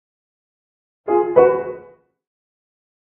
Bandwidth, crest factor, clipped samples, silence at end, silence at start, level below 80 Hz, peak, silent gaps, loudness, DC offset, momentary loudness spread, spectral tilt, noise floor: 3.2 kHz; 22 dB; under 0.1%; 1.25 s; 1.05 s; -64 dBFS; 0 dBFS; none; -16 LUFS; under 0.1%; 20 LU; -7 dB/octave; -45 dBFS